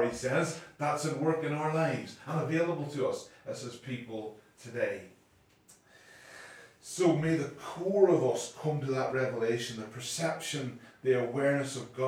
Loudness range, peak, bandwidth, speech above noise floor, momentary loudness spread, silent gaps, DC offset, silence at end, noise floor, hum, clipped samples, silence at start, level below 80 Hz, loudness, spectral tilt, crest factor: 11 LU; -10 dBFS; 16 kHz; 33 dB; 14 LU; none; under 0.1%; 0 s; -65 dBFS; none; under 0.1%; 0 s; -70 dBFS; -32 LUFS; -5.5 dB/octave; 22 dB